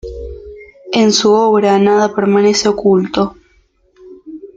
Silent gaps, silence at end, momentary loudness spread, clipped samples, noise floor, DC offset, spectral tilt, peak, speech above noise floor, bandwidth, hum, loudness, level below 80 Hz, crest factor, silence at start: none; 0.1 s; 20 LU; under 0.1%; -54 dBFS; under 0.1%; -4.5 dB/octave; 0 dBFS; 43 dB; 9 kHz; none; -12 LUFS; -40 dBFS; 14 dB; 0.05 s